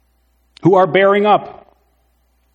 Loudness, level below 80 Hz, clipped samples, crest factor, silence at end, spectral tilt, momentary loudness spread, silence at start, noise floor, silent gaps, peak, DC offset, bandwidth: -13 LUFS; -60 dBFS; under 0.1%; 16 dB; 1.05 s; -8 dB/octave; 7 LU; 0.65 s; -59 dBFS; none; 0 dBFS; under 0.1%; 7.2 kHz